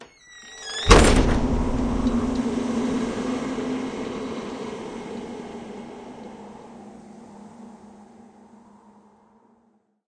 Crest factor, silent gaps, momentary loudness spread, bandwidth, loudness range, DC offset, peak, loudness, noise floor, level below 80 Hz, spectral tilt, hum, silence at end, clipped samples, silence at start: 26 dB; none; 26 LU; 11 kHz; 23 LU; under 0.1%; 0 dBFS; -23 LUFS; -64 dBFS; -30 dBFS; -5 dB/octave; none; 2.05 s; under 0.1%; 0 s